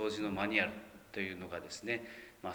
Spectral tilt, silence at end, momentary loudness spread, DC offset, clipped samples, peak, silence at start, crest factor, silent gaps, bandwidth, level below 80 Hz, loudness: -4.5 dB/octave; 0 s; 14 LU; under 0.1%; under 0.1%; -16 dBFS; 0 s; 22 dB; none; over 20 kHz; -68 dBFS; -38 LUFS